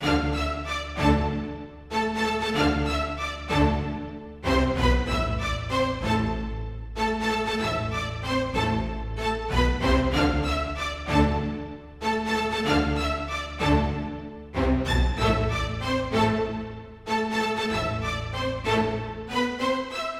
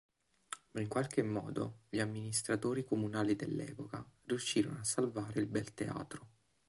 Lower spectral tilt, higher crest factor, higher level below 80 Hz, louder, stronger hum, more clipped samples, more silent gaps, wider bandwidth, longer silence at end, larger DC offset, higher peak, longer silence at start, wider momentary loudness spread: about the same, -5.5 dB/octave vs -5 dB/octave; about the same, 16 dB vs 20 dB; first, -32 dBFS vs -68 dBFS; first, -26 LUFS vs -38 LUFS; neither; neither; neither; first, 14.5 kHz vs 12 kHz; second, 0 s vs 0.4 s; neither; first, -8 dBFS vs -20 dBFS; second, 0 s vs 0.5 s; about the same, 9 LU vs 11 LU